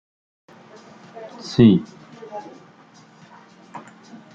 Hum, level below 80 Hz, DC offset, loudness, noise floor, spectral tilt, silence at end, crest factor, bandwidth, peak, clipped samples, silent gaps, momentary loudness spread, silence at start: none; -56 dBFS; under 0.1%; -17 LUFS; -49 dBFS; -8 dB/octave; 0.55 s; 22 dB; 7.6 kHz; -2 dBFS; under 0.1%; none; 28 LU; 1.2 s